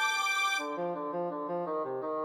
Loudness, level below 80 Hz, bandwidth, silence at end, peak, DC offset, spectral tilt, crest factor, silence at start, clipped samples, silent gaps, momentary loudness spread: -32 LUFS; under -90 dBFS; 17.5 kHz; 0 s; -18 dBFS; under 0.1%; -2.5 dB/octave; 14 dB; 0 s; under 0.1%; none; 7 LU